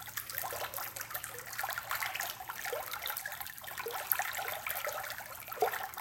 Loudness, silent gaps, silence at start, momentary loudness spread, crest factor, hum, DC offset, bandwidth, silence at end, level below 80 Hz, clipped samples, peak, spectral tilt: -37 LUFS; none; 0 s; 8 LU; 36 dB; none; under 0.1%; 17 kHz; 0 s; -68 dBFS; under 0.1%; -4 dBFS; -0.5 dB/octave